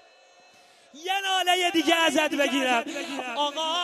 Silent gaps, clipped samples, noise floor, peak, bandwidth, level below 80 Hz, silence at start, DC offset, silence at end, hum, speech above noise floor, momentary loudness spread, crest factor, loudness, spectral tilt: none; under 0.1%; -56 dBFS; -8 dBFS; 13.5 kHz; -78 dBFS; 0.95 s; under 0.1%; 0 s; none; 31 dB; 10 LU; 20 dB; -24 LUFS; -1 dB/octave